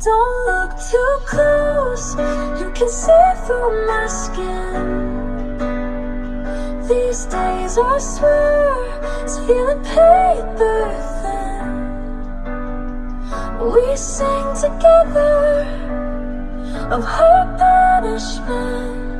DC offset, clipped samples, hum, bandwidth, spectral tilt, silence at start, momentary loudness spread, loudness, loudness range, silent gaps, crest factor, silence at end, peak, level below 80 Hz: under 0.1%; under 0.1%; none; 11 kHz; -4.5 dB/octave; 0 s; 15 LU; -17 LUFS; 7 LU; none; 16 dB; 0 s; 0 dBFS; -24 dBFS